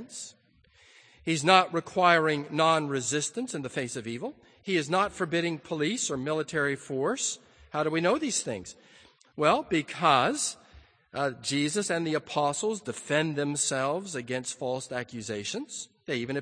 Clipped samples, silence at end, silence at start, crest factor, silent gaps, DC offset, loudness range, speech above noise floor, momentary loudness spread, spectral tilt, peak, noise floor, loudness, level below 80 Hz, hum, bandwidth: under 0.1%; 0 s; 0 s; 24 dB; none; under 0.1%; 5 LU; 33 dB; 14 LU; -3.5 dB/octave; -6 dBFS; -62 dBFS; -28 LUFS; -66 dBFS; none; 10 kHz